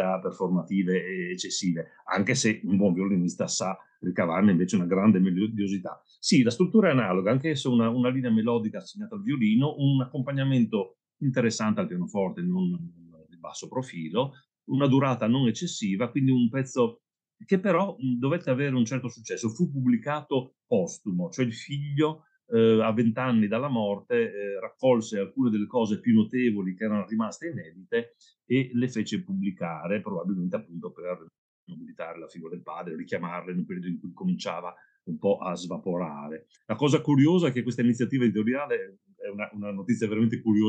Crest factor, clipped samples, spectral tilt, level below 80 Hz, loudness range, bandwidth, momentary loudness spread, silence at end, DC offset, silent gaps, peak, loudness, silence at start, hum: 18 dB; under 0.1%; -6 dB/octave; -78 dBFS; 8 LU; 9.2 kHz; 14 LU; 0 s; under 0.1%; 31.38-31.67 s; -8 dBFS; -27 LUFS; 0 s; none